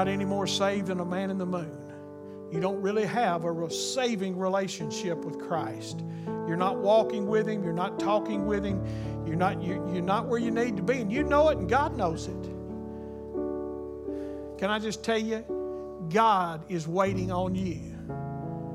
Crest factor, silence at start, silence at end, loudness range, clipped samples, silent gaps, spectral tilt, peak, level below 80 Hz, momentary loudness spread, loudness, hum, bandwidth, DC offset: 18 dB; 0 s; 0 s; 5 LU; under 0.1%; none; -5.5 dB/octave; -10 dBFS; -50 dBFS; 13 LU; -29 LUFS; none; 15 kHz; under 0.1%